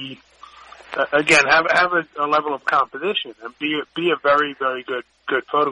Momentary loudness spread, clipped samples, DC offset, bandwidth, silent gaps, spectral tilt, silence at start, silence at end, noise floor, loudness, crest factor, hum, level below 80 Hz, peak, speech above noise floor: 13 LU; under 0.1%; under 0.1%; 10.5 kHz; none; -3 dB/octave; 0 s; 0 s; -38 dBFS; -19 LUFS; 18 dB; none; -58 dBFS; -2 dBFS; 18 dB